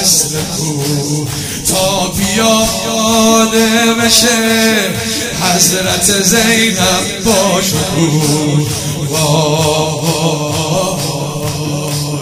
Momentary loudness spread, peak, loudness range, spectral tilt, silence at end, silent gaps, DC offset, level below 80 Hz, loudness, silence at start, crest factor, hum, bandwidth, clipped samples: 8 LU; 0 dBFS; 4 LU; -3 dB/octave; 0 s; none; under 0.1%; -38 dBFS; -11 LUFS; 0 s; 12 dB; none; 16.5 kHz; under 0.1%